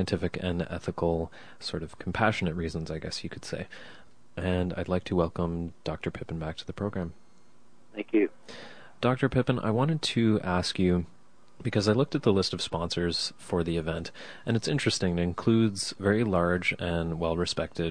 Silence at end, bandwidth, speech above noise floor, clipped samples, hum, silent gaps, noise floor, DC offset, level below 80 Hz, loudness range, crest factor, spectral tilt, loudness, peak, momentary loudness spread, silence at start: 0 s; 10.5 kHz; 33 dB; under 0.1%; none; none; -62 dBFS; 0.4%; -50 dBFS; 6 LU; 22 dB; -5.5 dB/octave; -29 LUFS; -8 dBFS; 12 LU; 0 s